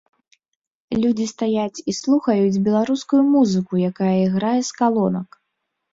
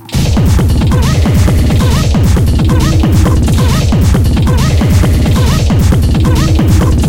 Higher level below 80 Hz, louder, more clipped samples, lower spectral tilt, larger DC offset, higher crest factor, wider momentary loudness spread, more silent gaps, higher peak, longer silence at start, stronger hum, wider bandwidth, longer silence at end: second, -58 dBFS vs -12 dBFS; second, -19 LUFS vs -9 LUFS; neither; about the same, -6.5 dB/octave vs -6.5 dB/octave; second, under 0.1% vs 2%; first, 14 dB vs 8 dB; first, 7 LU vs 1 LU; neither; second, -4 dBFS vs 0 dBFS; first, 0.9 s vs 0 s; neither; second, 7.8 kHz vs 17 kHz; first, 0.7 s vs 0 s